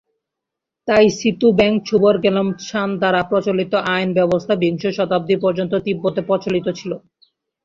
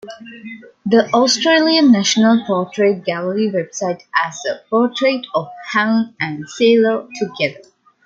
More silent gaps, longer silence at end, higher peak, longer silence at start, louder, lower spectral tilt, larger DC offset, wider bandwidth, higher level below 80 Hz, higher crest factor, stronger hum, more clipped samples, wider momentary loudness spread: neither; first, 0.65 s vs 0.5 s; about the same, -2 dBFS vs -2 dBFS; first, 0.85 s vs 0.05 s; about the same, -18 LUFS vs -16 LUFS; first, -6 dB/octave vs -4 dB/octave; neither; about the same, 7.6 kHz vs 7.6 kHz; first, -52 dBFS vs -66 dBFS; about the same, 16 dB vs 16 dB; neither; neither; second, 8 LU vs 12 LU